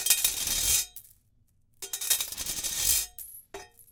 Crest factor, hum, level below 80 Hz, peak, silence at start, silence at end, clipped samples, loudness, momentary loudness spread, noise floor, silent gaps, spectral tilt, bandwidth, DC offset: 24 dB; none; -52 dBFS; -6 dBFS; 0 s; 0.1 s; under 0.1%; -26 LUFS; 21 LU; -66 dBFS; none; 1.5 dB/octave; 19 kHz; under 0.1%